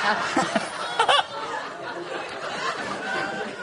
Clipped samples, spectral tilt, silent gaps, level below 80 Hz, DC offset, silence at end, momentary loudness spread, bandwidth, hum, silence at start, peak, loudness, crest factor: under 0.1%; -2.5 dB/octave; none; -66 dBFS; under 0.1%; 0 s; 12 LU; 10.5 kHz; none; 0 s; -6 dBFS; -26 LUFS; 20 dB